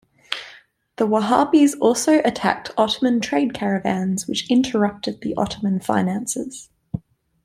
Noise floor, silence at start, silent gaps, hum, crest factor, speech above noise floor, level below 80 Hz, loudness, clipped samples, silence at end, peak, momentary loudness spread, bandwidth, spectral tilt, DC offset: -49 dBFS; 0.3 s; none; none; 18 dB; 29 dB; -56 dBFS; -20 LUFS; under 0.1%; 0.45 s; -2 dBFS; 14 LU; 15.5 kHz; -4.5 dB/octave; under 0.1%